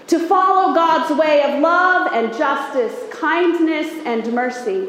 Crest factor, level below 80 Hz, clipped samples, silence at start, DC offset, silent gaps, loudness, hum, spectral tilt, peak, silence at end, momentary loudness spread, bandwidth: 14 dB; -70 dBFS; under 0.1%; 0.1 s; under 0.1%; none; -17 LUFS; none; -4 dB/octave; -2 dBFS; 0 s; 8 LU; 15.5 kHz